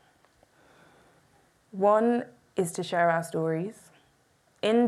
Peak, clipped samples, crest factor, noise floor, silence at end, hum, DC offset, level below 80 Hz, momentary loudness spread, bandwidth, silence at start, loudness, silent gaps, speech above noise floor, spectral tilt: -12 dBFS; under 0.1%; 18 dB; -66 dBFS; 0 s; none; under 0.1%; -76 dBFS; 12 LU; 14 kHz; 1.75 s; -27 LUFS; none; 40 dB; -5.5 dB/octave